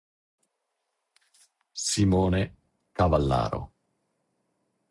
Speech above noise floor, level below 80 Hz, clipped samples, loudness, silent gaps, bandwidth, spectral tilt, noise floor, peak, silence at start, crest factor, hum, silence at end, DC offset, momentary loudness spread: 56 dB; -46 dBFS; under 0.1%; -26 LUFS; none; 11.5 kHz; -5.5 dB/octave; -80 dBFS; -10 dBFS; 1.75 s; 20 dB; none; 1.25 s; under 0.1%; 17 LU